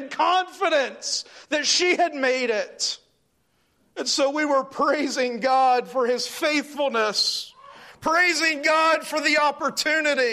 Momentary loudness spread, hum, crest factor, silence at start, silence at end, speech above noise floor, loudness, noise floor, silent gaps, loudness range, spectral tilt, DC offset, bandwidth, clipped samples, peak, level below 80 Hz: 8 LU; none; 14 dB; 0 s; 0 s; 46 dB; -22 LUFS; -68 dBFS; none; 3 LU; -1 dB/octave; under 0.1%; 15 kHz; under 0.1%; -8 dBFS; -68 dBFS